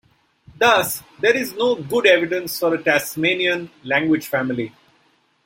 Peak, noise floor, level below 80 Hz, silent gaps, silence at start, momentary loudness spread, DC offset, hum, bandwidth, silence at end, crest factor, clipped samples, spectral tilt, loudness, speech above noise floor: -2 dBFS; -61 dBFS; -62 dBFS; none; 0.6 s; 9 LU; under 0.1%; none; 16.5 kHz; 0.75 s; 18 dB; under 0.1%; -3.5 dB/octave; -19 LUFS; 42 dB